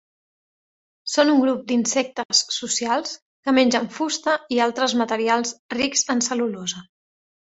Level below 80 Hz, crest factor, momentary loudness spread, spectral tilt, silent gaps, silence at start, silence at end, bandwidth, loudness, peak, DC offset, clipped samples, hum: -66 dBFS; 20 dB; 10 LU; -2 dB/octave; 2.25-2.29 s, 3.22-3.43 s, 5.59-5.69 s; 1.05 s; 0.75 s; 8.2 kHz; -21 LUFS; -2 dBFS; under 0.1%; under 0.1%; none